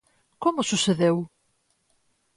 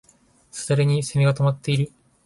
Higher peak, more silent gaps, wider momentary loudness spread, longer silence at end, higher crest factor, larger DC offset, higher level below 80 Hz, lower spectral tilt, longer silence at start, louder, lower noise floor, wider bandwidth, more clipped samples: about the same, -10 dBFS vs -8 dBFS; neither; second, 8 LU vs 12 LU; first, 1.1 s vs 0.35 s; about the same, 18 dB vs 14 dB; neither; second, -66 dBFS vs -56 dBFS; second, -4.5 dB/octave vs -6 dB/octave; second, 0.4 s vs 0.55 s; about the same, -24 LUFS vs -22 LUFS; first, -70 dBFS vs -56 dBFS; about the same, 11.5 kHz vs 11.5 kHz; neither